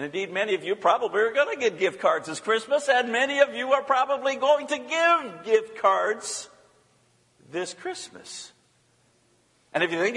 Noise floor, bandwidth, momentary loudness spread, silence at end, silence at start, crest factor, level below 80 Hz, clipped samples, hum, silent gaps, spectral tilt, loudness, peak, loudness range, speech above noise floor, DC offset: -64 dBFS; 11.5 kHz; 13 LU; 0 s; 0 s; 22 dB; -78 dBFS; under 0.1%; none; none; -2.5 dB/octave; -24 LUFS; -4 dBFS; 13 LU; 40 dB; under 0.1%